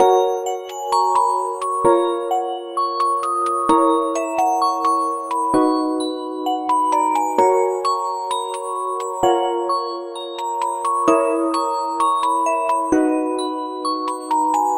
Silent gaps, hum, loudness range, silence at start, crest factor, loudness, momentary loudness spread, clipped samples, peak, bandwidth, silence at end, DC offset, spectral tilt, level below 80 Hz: none; none; 2 LU; 0 s; 18 dB; -19 LUFS; 8 LU; under 0.1%; -2 dBFS; 16.5 kHz; 0 s; under 0.1%; -3.5 dB/octave; -58 dBFS